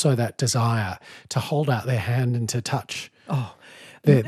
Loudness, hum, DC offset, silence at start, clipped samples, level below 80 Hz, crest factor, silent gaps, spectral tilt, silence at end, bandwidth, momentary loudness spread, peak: -25 LUFS; none; under 0.1%; 0 s; under 0.1%; -66 dBFS; 20 dB; none; -5.5 dB/octave; 0 s; 14 kHz; 12 LU; -4 dBFS